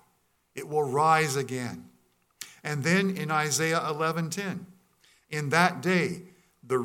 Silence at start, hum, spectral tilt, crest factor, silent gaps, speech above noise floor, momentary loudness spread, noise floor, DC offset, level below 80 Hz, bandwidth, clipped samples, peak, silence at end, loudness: 0.55 s; none; -4.5 dB/octave; 22 dB; none; 43 dB; 18 LU; -70 dBFS; under 0.1%; -74 dBFS; 17 kHz; under 0.1%; -8 dBFS; 0 s; -27 LUFS